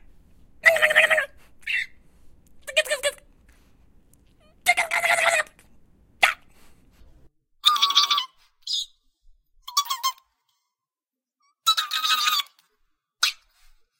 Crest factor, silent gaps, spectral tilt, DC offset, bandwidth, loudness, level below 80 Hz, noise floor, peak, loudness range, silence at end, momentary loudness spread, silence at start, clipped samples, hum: 24 dB; none; 2 dB/octave; under 0.1%; 17 kHz; -21 LUFS; -60 dBFS; under -90 dBFS; -2 dBFS; 6 LU; 0.65 s; 18 LU; 0.65 s; under 0.1%; none